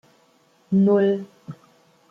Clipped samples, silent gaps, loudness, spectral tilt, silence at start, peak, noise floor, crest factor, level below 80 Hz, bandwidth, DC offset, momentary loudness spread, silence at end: under 0.1%; none; -20 LUFS; -9.5 dB/octave; 0.7 s; -8 dBFS; -60 dBFS; 14 dB; -68 dBFS; 4.9 kHz; under 0.1%; 24 LU; 0.55 s